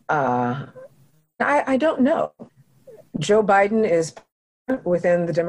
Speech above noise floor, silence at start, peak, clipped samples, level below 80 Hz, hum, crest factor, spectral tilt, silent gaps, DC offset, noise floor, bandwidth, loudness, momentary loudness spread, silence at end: 38 dB; 0.1 s; -8 dBFS; under 0.1%; -58 dBFS; none; 14 dB; -6 dB/octave; 4.32-4.65 s; under 0.1%; -58 dBFS; 11.5 kHz; -21 LUFS; 13 LU; 0 s